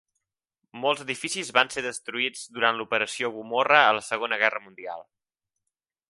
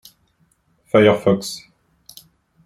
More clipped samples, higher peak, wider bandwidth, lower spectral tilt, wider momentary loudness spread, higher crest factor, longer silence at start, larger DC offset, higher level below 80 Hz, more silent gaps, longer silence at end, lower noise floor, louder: neither; about the same, -2 dBFS vs -2 dBFS; second, 11.5 kHz vs 15 kHz; second, -2 dB/octave vs -5.5 dB/octave; about the same, 15 LU vs 17 LU; first, 26 dB vs 18 dB; second, 0.75 s vs 0.95 s; neither; second, -74 dBFS vs -58 dBFS; neither; about the same, 1.1 s vs 1.05 s; first, -86 dBFS vs -62 dBFS; second, -24 LUFS vs -17 LUFS